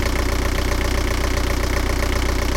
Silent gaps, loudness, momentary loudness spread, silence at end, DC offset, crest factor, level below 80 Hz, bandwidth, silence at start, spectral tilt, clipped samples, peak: none; -22 LUFS; 0 LU; 0 s; under 0.1%; 12 dB; -22 dBFS; 17 kHz; 0 s; -4.5 dB/octave; under 0.1%; -6 dBFS